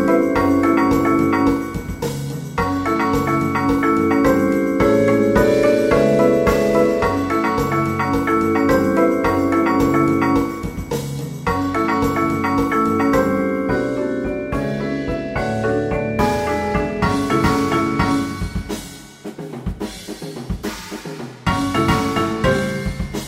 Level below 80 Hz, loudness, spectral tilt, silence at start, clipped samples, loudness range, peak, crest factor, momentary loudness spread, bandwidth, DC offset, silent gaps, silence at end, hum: -36 dBFS; -18 LUFS; -6.5 dB/octave; 0 s; under 0.1%; 7 LU; -4 dBFS; 14 dB; 12 LU; 16 kHz; under 0.1%; none; 0 s; none